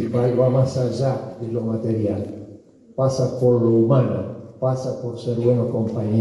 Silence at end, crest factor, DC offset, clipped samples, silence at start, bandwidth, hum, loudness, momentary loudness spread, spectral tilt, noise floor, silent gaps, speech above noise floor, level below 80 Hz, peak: 0 s; 16 dB; under 0.1%; under 0.1%; 0 s; 11 kHz; none; -21 LUFS; 11 LU; -8.5 dB/octave; -45 dBFS; none; 25 dB; -58 dBFS; -6 dBFS